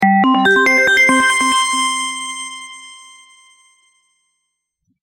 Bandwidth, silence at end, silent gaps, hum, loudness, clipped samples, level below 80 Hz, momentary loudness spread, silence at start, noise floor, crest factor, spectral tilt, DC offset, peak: 17 kHz; 2.1 s; none; none; -12 LUFS; under 0.1%; -56 dBFS; 19 LU; 0 s; -73 dBFS; 16 dB; -2.5 dB/octave; under 0.1%; -2 dBFS